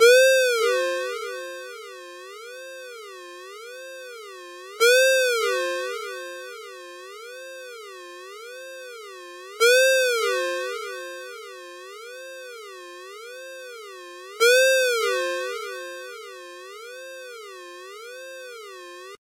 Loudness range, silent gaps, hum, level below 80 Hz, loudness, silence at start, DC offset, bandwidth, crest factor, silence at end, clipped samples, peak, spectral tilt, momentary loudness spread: 15 LU; none; none; under -90 dBFS; -21 LUFS; 0 s; under 0.1%; 16 kHz; 22 dB; 0.05 s; under 0.1%; -4 dBFS; 2.5 dB/octave; 23 LU